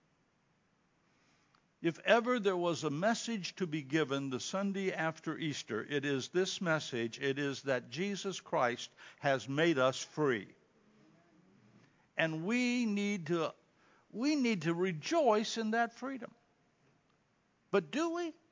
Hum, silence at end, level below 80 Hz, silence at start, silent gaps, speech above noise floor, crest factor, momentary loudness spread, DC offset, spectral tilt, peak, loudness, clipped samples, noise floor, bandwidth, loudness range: none; 0.2 s; -86 dBFS; 1.8 s; none; 40 dB; 24 dB; 9 LU; under 0.1%; -5 dB/octave; -12 dBFS; -35 LUFS; under 0.1%; -74 dBFS; 7.6 kHz; 3 LU